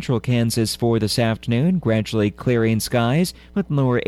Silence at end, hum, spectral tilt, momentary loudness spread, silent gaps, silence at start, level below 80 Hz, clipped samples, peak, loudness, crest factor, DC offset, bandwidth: 0 s; none; -6 dB/octave; 3 LU; none; 0 s; -46 dBFS; under 0.1%; -8 dBFS; -20 LUFS; 12 dB; under 0.1%; 14 kHz